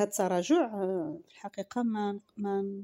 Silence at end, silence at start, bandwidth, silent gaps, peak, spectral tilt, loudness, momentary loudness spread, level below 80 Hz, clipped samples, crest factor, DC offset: 0 s; 0 s; 16 kHz; none; -16 dBFS; -5.5 dB/octave; -31 LUFS; 14 LU; -78 dBFS; under 0.1%; 16 dB; under 0.1%